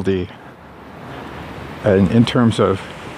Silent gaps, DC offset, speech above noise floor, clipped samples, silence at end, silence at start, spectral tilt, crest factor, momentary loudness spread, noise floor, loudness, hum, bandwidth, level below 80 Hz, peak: none; under 0.1%; 23 dB; under 0.1%; 0 s; 0 s; -7 dB/octave; 18 dB; 21 LU; -38 dBFS; -16 LUFS; none; 11.5 kHz; -44 dBFS; 0 dBFS